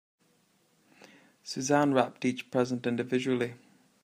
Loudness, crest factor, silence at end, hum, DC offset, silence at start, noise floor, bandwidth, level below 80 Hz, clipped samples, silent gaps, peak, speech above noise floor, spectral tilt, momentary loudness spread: -30 LUFS; 22 dB; 0.5 s; none; under 0.1%; 1.45 s; -69 dBFS; 15.5 kHz; -74 dBFS; under 0.1%; none; -10 dBFS; 40 dB; -5 dB/octave; 11 LU